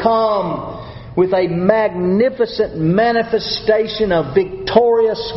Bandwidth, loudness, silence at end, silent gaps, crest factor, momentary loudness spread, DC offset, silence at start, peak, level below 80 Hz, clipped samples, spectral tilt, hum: 6 kHz; -16 LUFS; 0 s; none; 16 dB; 6 LU; under 0.1%; 0 s; 0 dBFS; -42 dBFS; under 0.1%; -4.5 dB/octave; none